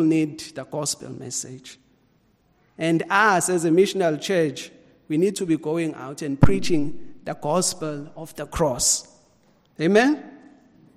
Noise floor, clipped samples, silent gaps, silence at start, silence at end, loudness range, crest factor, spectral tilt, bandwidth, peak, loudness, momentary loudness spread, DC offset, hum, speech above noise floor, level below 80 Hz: -62 dBFS; under 0.1%; none; 0 s; 0.6 s; 3 LU; 20 dB; -4.5 dB/octave; 15 kHz; -4 dBFS; -22 LUFS; 17 LU; under 0.1%; none; 41 dB; -42 dBFS